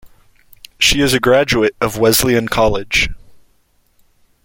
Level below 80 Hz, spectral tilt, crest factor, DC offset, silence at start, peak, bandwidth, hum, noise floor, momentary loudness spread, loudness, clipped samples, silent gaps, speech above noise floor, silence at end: -34 dBFS; -3.5 dB/octave; 16 dB; under 0.1%; 0.05 s; 0 dBFS; 17 kHz; none; -57 dBFS; 4 LU; -14 LUFS; under 0.1%; none; 43 dB; 1.3 s